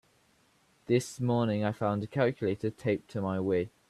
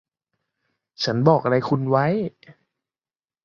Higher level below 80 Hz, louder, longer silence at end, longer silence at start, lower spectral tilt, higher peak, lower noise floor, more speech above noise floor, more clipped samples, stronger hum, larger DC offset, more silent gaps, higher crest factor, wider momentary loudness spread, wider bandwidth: about the same, -66 dBFS vs -64 dBFS; second, -31 LUFS vs -21 LUFS; second, 0.2 s vs 1.15 s; about the same, 0.9 s vs 1 s; about the same, -7 dB/octave vs -7 dB/octave; second, -14 dBFS vs -2 dBFS; second, -67 dBFS vs under -90 dBFS; second, 38 dB vs over 70 dB; neither; neither; neither; neither; about the same, 18 dB vs 20 dB; second, 4 LU vs 9 LU; first, 13.5 kHz vs 7.2 kHz